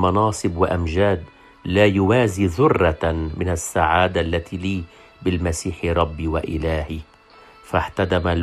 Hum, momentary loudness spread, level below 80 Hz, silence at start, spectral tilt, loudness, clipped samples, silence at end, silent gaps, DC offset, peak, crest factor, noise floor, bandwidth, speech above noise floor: none; 9 LU; -38 dBFS; 0 s; -6 dB/octave; -21 LUFS; under 0.1%; 0 s; none; under 0.1%; -2 dBFS; 18 dB; -48 dBFS; 13 kHz; 28 dB